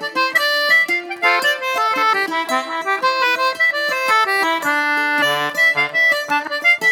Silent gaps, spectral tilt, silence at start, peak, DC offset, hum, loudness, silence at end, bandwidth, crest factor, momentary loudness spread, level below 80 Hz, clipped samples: none; -1.5 dB/octave; 0 s; -2 dBFS; under 0.1%; none; -16 LUFS; 0 s; 19 kHz; 14 dB; 5 LU; -72 dBFS; under 0.1%